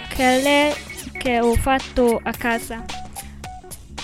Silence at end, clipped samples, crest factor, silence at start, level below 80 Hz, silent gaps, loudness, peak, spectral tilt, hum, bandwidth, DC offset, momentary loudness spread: 0 s; under 0.1%; 16 dB; 0 s; -34 dBFS; none; -20 LUFS; -6 dBFS; -4 dB/octave; none; 16.5 kHz; under 0.1%; 19 LU